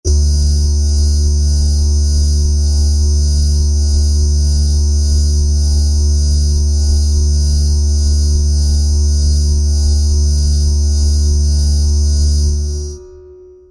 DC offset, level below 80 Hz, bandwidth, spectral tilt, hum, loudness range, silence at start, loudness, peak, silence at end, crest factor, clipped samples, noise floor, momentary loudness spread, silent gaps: under 0.1%; -14 dBFS; 11.5 kHz; -5.5 dB/octave; none; 0 LU; 0.05 s; -14 LUFS; -4 dBFS; 0.35 s; 8 dB; under 0.1%; -38 dBFS; 1 LU; none